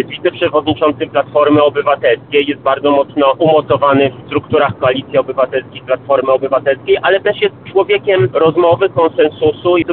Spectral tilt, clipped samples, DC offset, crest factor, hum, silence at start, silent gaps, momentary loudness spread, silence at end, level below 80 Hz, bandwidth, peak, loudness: -4 dB/octave; under 0.1%; 0.1%; 12 dB; none; 0 s; none; 5 LU; 0 s; -50 dBFS; 4.3 kHz; 0 dBFS; -13 LUFS